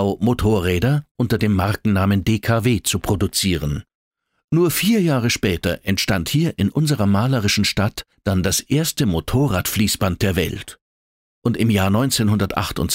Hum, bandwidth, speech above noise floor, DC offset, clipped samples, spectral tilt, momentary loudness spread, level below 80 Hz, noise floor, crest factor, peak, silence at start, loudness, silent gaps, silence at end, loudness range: none; 16.5 kHz; over 71 dB; under 0.1%; under 0.1%; -5 dB/octave; 5 LU; -38 dBFS; under -90 dBFS; 16 dB; -2 dBFS; 0 s; -19 LUFS; 1.11-1.15 s, 3.95-4.11 s, 4.44-4.48 s, 10.81-11.42 s; 0 s; 2 LU